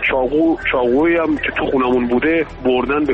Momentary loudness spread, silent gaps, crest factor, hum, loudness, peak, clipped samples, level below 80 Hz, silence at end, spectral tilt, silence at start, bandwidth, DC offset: 3 LU; none; 10 dB; none; -16 LUFS; -6 dBFS; under 0.1%; -38 dBFS; 0 s; -7.5 dB/octave; 0 s; 5.6 kHz; under 0.1%